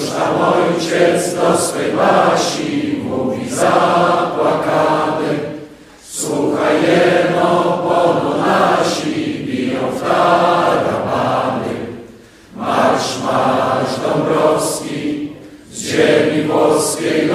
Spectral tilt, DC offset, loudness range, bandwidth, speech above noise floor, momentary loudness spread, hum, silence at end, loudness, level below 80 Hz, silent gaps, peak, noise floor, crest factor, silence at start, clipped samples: -4.5 dB/octave; under 0.1%; 3 LU; 15.5 kHz; 26 dB; 9 LU; none; 0 s; -15 LUFS; -54 dBFS; none; 0 dBFS; -40 dBFS; 16 dB; 0 s; under 0.1%